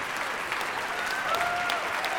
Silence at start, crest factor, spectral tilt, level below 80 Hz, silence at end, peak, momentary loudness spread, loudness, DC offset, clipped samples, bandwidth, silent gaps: 0 s; 20 dB; -1.5 dB/octave; -60 dBFS; 0 s; -10 dBFS; 3 LU; -28 LUFS; under 0.1%; under 0.1%; 19.5 kHz; none